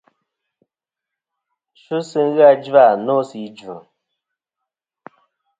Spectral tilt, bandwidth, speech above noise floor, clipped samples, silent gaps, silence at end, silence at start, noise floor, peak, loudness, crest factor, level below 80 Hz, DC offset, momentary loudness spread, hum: -6.5 dB/octave; 7.8 kHz; 70 dB; under 0.1%; none; 1.8 s; 1.9 s; -85 dBFS; 0 dBFS; -15 LUFS; 20 dB; -72 dBFS; under 0.1%; 23 LU; none